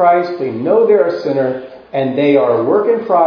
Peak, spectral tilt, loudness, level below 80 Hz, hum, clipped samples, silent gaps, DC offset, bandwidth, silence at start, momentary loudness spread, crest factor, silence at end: 0 dBFS; -8.5 dB/octave; -14 LUFS; -62 dBFS; none; under 0.1%; none; under 0.1%; 5.4 kHz; 0 s; 8 LU; 12 dB; 0 s